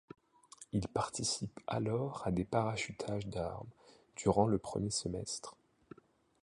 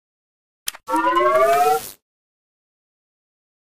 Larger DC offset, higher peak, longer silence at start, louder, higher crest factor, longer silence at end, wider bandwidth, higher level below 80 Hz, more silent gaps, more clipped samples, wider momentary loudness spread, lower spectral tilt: neither; second, -16 dBFS vs -4 dBFS; about the same, 0.6 s vs 0.65 s; second, -37 LUFS vs -18 LUFS; about the same, 22 dB vs 18 dB; second, 0.9 s vs 1.8 s; second, 11.5 kHz vs 16 kHz; about the same, -58 dBFS vs -58 dBFS; neither; neither; second, 11 LU vs 15 LU; first, -5 dB/octave vs -2.5 dB/octave